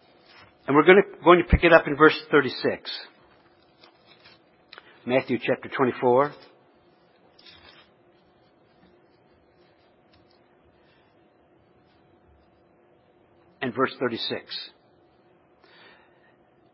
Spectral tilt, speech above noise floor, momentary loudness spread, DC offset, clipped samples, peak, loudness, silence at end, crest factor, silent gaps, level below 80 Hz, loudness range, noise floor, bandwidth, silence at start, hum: -10 dB/octave; 39 dB; 18 LU; under 0.1%; under 0.1%; 0 dBFS; -21 LUFS; 2.05 s; 26 dB; none; -42 dBFS; 13 LU; -60 dBFS; 5.8 kHz; 0.7 s; none